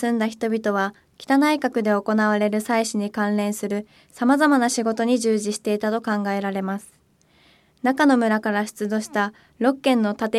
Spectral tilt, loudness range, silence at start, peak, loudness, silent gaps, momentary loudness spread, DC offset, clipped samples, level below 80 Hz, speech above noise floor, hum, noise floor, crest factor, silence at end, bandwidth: -5 dB/octave; 2 LU; 0 s; -6 dBFS; -22 LUFS; none; 8 LU; under 0.1%; under 0.1%; -68 dBFS; 38 dB; none; -59 dBFS; 16 dB; 0 s; 15 kHz